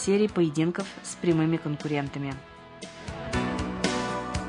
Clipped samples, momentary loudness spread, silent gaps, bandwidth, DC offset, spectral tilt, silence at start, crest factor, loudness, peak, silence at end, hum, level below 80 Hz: under 0.1%; 16 LU; none; 11 kHz; under 0.1%; -5.5 dB/octave; 0 s; 20 dB; -28 LUFS; -8 dBFS; 0 s; none; -48 dBFS